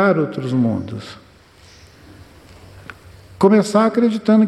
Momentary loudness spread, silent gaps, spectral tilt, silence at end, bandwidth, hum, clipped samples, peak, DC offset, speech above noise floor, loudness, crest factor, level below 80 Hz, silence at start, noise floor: 25 LU; none; -7 dB/octave; 0 s; 11.5 kHz; none; under 0.1%; -4 dBFS; under 0.1%; 31 dB; -17 LUFS; 16 dB; -54 dBFS; 0 s; -47 dBFS